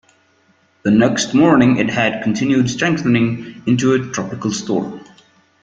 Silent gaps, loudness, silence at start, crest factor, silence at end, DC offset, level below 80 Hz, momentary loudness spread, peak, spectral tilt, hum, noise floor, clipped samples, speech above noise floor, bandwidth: none; -16 LUFS; 0.85 s; 16 dB; 0.6 s; under 0.1%; -52 dBFS; 11 LU; -2 dBFS; -5.5 dB/octave; none; -57 dBFS; under 0.1%; 41 dB; 9 kHz